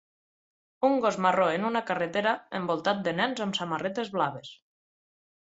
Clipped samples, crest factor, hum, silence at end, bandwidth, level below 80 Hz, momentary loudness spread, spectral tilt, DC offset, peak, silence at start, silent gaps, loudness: under 0.1%; 20 dB; none; 0.9 s; 8 kHz; -72 dBFS; 6 LU; -5 dB/octave; under 0.1%; -10 dBFS; 0.8 s; none; -28 LUFS